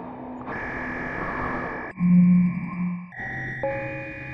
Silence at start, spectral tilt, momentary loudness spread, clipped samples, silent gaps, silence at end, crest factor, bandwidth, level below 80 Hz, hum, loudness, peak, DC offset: 0 s; -10 dB/octave; 15 LU; under 0.1%; none; 0 s; 14 dB; 3.8 kHz; -48 dBFS; none; -25 LUFS; -10 dBFS; under 0.1%